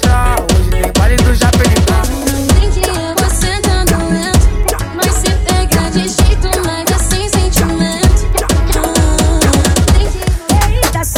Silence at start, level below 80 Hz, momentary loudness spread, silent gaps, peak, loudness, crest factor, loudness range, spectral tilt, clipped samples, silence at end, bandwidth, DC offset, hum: 0 s; -14 dBFS; 4 LU; none; 0 dBFS; -12 LUFS; 10 dB; 1 LU; -4.5 dB/octave; under 0.1%; 0 s; 19.5 kHz; under 0.1%; none